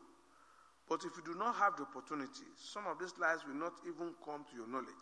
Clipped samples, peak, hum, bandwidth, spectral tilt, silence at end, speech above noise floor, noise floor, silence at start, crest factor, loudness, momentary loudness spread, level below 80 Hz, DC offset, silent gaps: under 0.1%; -22 dBFS; none; 11 kHz; -3.5 dB/octave; 0 s; 25 dB; -67 dBFS; 0 s; 22 dB; -41 LUFS; 13 LU; -88 dBFS; under 0.1%; none